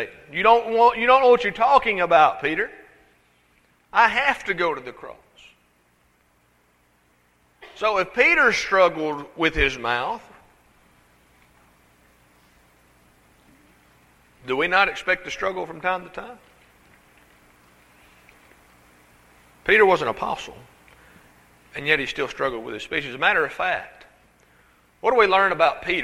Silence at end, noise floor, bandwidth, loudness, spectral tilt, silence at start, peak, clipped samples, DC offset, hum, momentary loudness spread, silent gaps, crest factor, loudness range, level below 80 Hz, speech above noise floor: 0 s; -62 dBFS; 13.5 kHz; -20 LUFS; -4 dB/octave; 0 s; -2 dBFS; under 0.1%; under 0.1%; 60 Hz at -65 dBFS; 15 LU; none; 22 dB; 12 LU; -48 dBFS; 41 dB